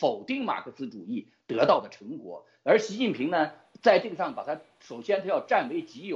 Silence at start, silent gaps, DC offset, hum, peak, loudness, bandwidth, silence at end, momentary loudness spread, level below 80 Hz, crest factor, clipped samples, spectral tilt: 0 s; none; under 0.1%; none; -6 dBFS; -27 LUFS; 7.8 kHz; 0 s; 16 LU; -76 dBFS; 22 dB; under 0.1%; -5 dB/octave